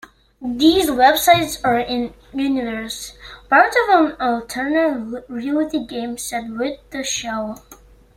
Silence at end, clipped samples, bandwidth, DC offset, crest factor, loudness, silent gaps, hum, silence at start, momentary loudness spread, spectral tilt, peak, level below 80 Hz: 0.4 s; under 0.1%; 16.5 kHz; under 0.1%; 18 dB; -18 LUFS; none; none; 0.4 s; 15 LU; -3 dB/octave; -2 dBFS; -48 dBFS